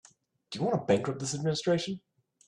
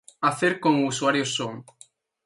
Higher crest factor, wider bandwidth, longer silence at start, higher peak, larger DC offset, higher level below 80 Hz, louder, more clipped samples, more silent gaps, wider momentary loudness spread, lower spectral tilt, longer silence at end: about the same, 20 dB vs 20 dB; about the same, 11.5 kHz vs 11.5 kHz; first, 0.5 s vs 0.2 s; second, -10 dBFS vs -6 dBFS; neither; about the same, -68 dBFS vs -70 dBFS; second, -30 LUFS vs -24 LUFS; neither; neither; about the same, 12 LU vs 10 LU; about the same, -5 dB/octave vs -4 dB/octave; second, 0.5 s vs 0.65 s